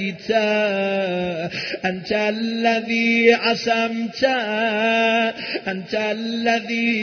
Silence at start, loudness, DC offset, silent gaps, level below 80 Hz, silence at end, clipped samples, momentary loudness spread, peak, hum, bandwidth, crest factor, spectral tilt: 0 s; -20 LUFS; under 0.1%; none; -62 dBFS; 0 s; under 0.1%; 9 LU; -2 dBFS; none; 6.6 kHz; 18 dB; -4.5 dB/octave